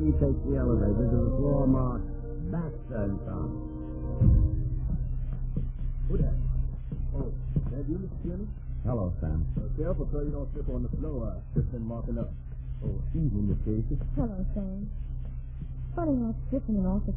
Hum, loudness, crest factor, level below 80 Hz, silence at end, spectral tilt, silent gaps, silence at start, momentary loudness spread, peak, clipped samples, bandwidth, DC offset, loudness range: none; -31 LUFS; 16 dB; -32 dBFS; 0 s; -14 dB/octave; none; 0 s; 11 LU; -12 dBFS; under 0.1%; 2.7 kHz; under 0.1%; 4 LU